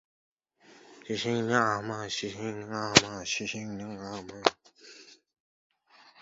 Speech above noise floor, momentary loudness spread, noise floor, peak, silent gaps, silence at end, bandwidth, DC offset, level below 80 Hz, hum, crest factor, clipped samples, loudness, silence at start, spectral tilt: 29 dB; 17 LU; -59 dBFS; 0 dBFS; 5.40-5.70 s; 0 s; 7.6 kHz; under 0.1%; -62 dBFS; none; 32 dB; under 0.1%; -29 LUFS; 0.7 s; -2.5 dB/octave